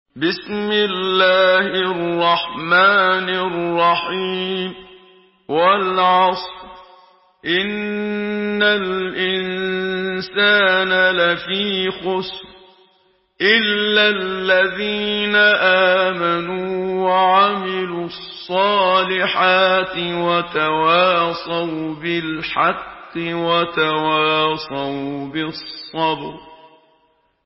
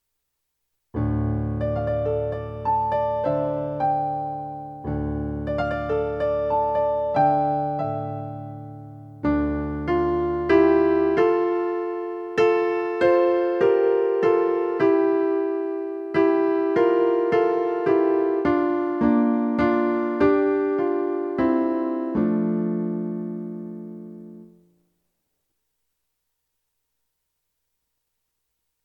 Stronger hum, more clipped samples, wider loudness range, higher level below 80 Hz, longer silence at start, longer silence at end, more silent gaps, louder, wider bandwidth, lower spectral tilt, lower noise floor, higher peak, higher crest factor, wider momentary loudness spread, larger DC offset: neither; neither; about the same, 4 LU vs 5 LU; second, -56 dBFS vs -44 dBFS; second, 0.15 s vs 0.95 s; second, 0.8 s vs 4.4 s; neither; first, -17 LUFS vs -22 LUFS; about the same, 5.8 kHz vs 6.2 kHz; about the same, -8.5 dB/octave vs -9 dB/octave; second, -61 dBFS vs -78 dBFS; first, -2 dBFS vs -6 dBFS; about the same, 16 dB vs 18 dB; about the same, 11 LU vs 11 LU; neither